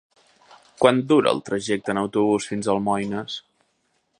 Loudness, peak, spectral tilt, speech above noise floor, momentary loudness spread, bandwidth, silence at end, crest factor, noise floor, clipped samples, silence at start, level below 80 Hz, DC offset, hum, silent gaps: -22 LUFS; -2 dBFS; -5 dB/octave; 48 dB; 10 LU; 11 kHz; 0.8 s; 22 dB; -70 dBFS; under 0.1%; 0.8 s; -62 dBFS; under 0.1%; none; none